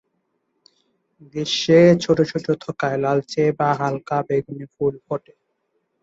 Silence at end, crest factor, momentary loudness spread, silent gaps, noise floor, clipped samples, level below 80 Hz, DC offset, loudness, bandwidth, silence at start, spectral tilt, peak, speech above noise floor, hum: 0.85 s; 18 dB; 16 LU; none; -72 dBFS; under 0.1%; -60 dBFS; under 0.1%; -20 LUFS; 8 kHz; 1.35 s; -6 dB/octave; -2 dBFS; 52 dB; none